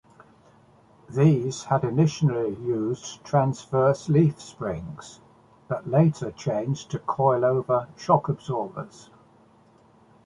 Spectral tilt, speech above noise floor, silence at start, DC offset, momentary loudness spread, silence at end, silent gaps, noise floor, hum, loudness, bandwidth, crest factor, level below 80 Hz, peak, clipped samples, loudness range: -7.5 dB/octave; 33 dB; 1.1 s; under 0.1%; 13 LU; 1.4 s; none; -57 dBFS; none; -25 LUFS; 10.5 kHz; 20 dB; -58 dBFS; -4 dBFS; under 0.1%; 2 LU